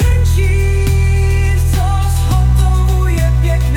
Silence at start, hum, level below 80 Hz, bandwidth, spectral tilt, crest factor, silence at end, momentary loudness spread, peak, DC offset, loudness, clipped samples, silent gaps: 0 s; none; -14 dBFS; 16.5 kHz; -6 dB/octave; 8 dB; 0 s; 2 LU; -2 dBFS; under 0.1%; -14 LUFS; under 0.1%; none